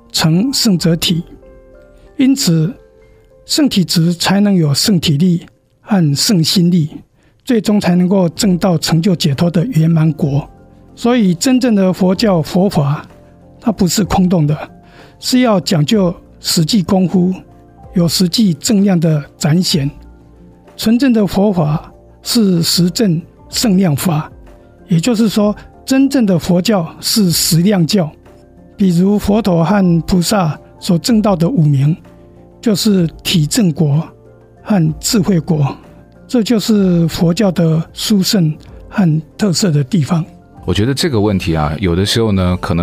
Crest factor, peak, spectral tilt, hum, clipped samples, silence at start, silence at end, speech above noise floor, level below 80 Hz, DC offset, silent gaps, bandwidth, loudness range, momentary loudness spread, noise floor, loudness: 10 dB; -2 dBFS; -5.5 dB/octave; none; under 0.1%; 0.15 s; 0 s; 32 dB; -38 dBFS; under 0.1%; none; 16 kHz; 2 LU; 7 LU; -45 dBFS; -13 LUFS